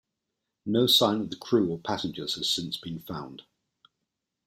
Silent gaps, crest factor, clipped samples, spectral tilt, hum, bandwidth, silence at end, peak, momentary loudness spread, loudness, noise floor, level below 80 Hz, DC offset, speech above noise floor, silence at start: none; 22 dB; under 0.1%; -4.5 dB/octave; none; 16 kHz; 1.05 s; -8 dBFS; 18 LU; -26 LUFS; -84 dBFS; -66 dBFS; under 0.1%; 57 dB; 0.65 s